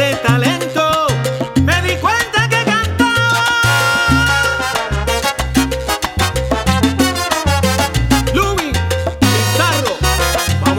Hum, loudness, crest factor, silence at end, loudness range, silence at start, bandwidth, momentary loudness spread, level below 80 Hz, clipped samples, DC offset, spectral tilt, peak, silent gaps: none; -14 LUFS; 14 dB; 0 s; 2 LU; 0 s; 19 kHz; 5 LU; -26 dBFS; under 0.1%; under 0.1%; -4 dB/octave; 0 dBFS; none